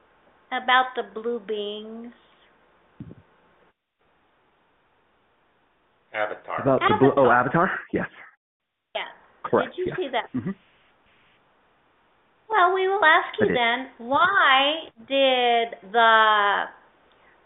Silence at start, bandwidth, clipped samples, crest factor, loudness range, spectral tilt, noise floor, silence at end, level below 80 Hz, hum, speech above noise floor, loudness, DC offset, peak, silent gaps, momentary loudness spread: 0.5 s; 4.1 kHz; under 0.1%; 22 dB; 14 LU; -1.5 dB/octave; -68 dBFS; 0.75 s; -62 dBFS; none; 46 dB; -21 LUFS; under 0.1%; -4 dBFS; 8.37-8.60 s; 17 LU